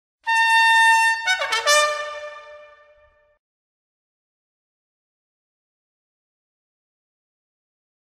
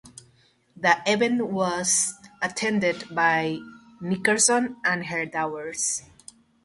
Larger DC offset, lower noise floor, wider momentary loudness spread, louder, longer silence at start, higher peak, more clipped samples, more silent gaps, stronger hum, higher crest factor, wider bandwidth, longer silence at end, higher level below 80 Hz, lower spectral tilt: neither; second, -57 dBFS vs -61 dBFS; first, 17 LU vs 11 LU; first, -16 LUFS vs -24 LUFS; first, 0.25 s vs 0.05 s; about the same, -4 dBFS vs -4 dBFS; neither; neither; neither; about the same, 20 dB vs 20 dB; first, 16 kHz vs 12 kHz; first, 5.6 s vs 0.65 s; about the same, -68 dBFS vs -66 dBFS; second, 4 dB/octave vs -2.5 dB/octave